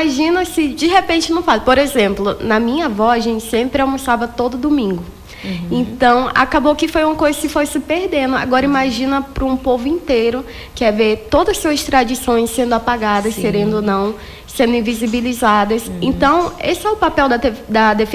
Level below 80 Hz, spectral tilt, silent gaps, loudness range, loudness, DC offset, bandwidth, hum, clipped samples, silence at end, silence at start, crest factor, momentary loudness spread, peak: -36 dBFS; -4.5 dB/octave; none; 2 LU; -15 LUFS; under 0.1%; 16 kHz; none; under 0.1%; 0 s; 0 s; 14 dB; 6 LU; 0 dBFS